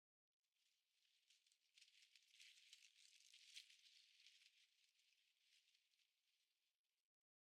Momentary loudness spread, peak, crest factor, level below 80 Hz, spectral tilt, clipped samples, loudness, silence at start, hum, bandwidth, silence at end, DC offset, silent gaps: 5 LU; -44 dBFS; 30 dB; under -90 dBFS; 4 dB/octave; under 0.1%; -66 LUFS; 0.45 s; none; 12 kHz; 0.55 s; under 0.1%; 6.75-6.84 s